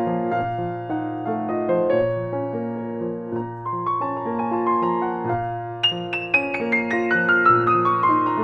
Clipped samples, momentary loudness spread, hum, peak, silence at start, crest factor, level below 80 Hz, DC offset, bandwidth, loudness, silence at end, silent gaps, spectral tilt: under 0.1%; 11 LU; none; -4 dBFS; 0 s; 18 dB; -54 dBFS; under 0.1%; 6.2 kHz; -22 LUFS; 0 s; none; -7 dB/octave